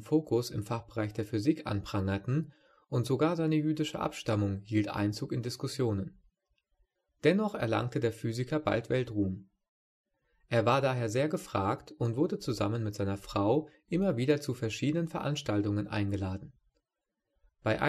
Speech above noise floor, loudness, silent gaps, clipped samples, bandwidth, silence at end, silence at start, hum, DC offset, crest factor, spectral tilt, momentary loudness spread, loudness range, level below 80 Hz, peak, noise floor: 56 dB; -32 LUFS; 9.69-10.04 s; under 0.1%; 13 kHz; 0 s; 0 s; none; under 0.1%; 20 dB; -6.5 dB/octave; 7 LU; 2 LU; -60 dBFS; -12 dBFS; -87 dBFS